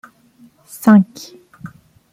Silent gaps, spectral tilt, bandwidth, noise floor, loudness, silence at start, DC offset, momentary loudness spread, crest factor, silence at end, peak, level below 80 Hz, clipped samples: none; -7 dB/octave; 16 kHz; -50 dBFS; -14 LUFS; 0.85 s; under 0.1%; 26 LU; 16 dB; 0.45 s; -2 dBFS; -60 dBFS; under 0.1%